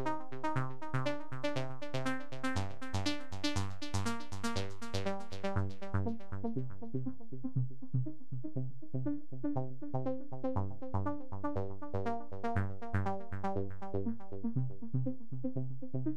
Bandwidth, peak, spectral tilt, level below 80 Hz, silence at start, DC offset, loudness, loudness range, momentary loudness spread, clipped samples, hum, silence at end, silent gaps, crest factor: 13 kHz; -18 dBFS; -6.5 dB/octave; -62 dBFS; 0 s; 2%; -39 LUFS; 2 LU; 4 LU; under 0.1%; none; 0 s; none; 20 dB